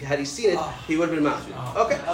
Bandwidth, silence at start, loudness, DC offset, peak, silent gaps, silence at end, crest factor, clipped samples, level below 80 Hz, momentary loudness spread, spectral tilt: 16 kHz; 0 s; -25 LUFS; under 0.1%; -6 dBFS; none; 0 s; 18 dB; under 0.1%; -50 dBFS; 6 LU; -5 dB/octave